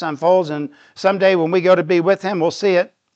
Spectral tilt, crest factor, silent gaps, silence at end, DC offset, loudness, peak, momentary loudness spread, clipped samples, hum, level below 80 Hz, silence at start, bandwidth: -6 dB/octave; 16 dB; none; 0.3 s; under 0.1%; -16 LUFS; -2 dBFS; 7 LU; under 0.1%; none; -72 dBFS; 0 s; 8 kHz